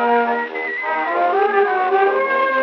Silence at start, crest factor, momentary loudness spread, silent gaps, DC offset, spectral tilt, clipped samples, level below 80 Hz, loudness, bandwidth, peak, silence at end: 0 s; 14 dB; 5 LU; none; under 0.1%; 0 dB/octave; under 0.1%; under -90 dBFS; -18 LUFS; 6 kHz; -4 dBFS; 0 s